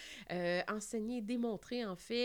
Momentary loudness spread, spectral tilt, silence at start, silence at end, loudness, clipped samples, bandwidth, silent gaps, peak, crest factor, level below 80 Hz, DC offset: 5 LU; -4.5 dB/octave; 0 s; 0 s; -39 LUFS; under 0.1%; 20 kHz; none; -22 dBFS; 16 dB; -70 dBFS; under 0.1%